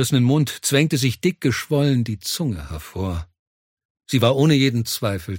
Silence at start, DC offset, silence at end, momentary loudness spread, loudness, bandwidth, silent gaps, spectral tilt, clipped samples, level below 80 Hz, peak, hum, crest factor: 0 s; under 0.1%; 0 s; 11 LU; -20 LUFS; 17 kHz; 3.39-3.77 s, 3.85-3.95 s; -5.5 dB/octave; under 0.1%; -44 dBFS; -2 dBFS; none; 18 dB